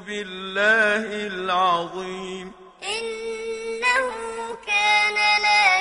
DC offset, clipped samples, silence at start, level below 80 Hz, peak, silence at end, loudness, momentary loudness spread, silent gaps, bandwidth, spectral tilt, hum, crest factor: under 0.1%; under 0.1%; 0 s; -58 dBFS; -4 dBFS; 0 s; -21 LUFS; 15 LU; none; 11 kHz; -2 dB/octave; none; 18 dB